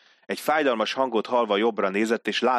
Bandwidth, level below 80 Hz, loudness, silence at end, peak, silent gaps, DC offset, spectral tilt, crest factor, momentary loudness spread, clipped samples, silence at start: 14 kHz; -76 dBFS; -24 LUFS; 0 s; -8 dBFS; none; under 0.1%; -4 dB/octave; 16 dB; 3 LU; under 0.1%; 0.3 s